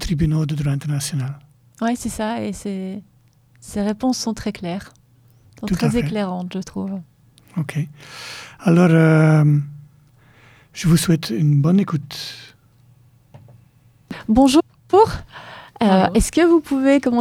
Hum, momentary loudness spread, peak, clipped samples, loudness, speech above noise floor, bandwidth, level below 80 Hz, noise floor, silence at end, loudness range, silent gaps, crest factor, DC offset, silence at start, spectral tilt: none; 19 LU; -2 dBFS; under 0.1%; -19 LUFS; 36 dB; 15.5 kHz; -40 dBFS; -54 dBFS; 0 s; 8 LU; none; 18 dB; under 0.1%; 0 s; -6.5 dB/octave